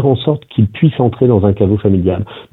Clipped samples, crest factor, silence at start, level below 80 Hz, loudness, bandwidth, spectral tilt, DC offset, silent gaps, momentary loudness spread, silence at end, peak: under 0.1%; 12 dB; 0 s; -40 dBFS; -13 LUFS; 4.1 kHz; -11 dB/octave; under 0.1%; none; 5 LU; 0.1 s; 0 dBFS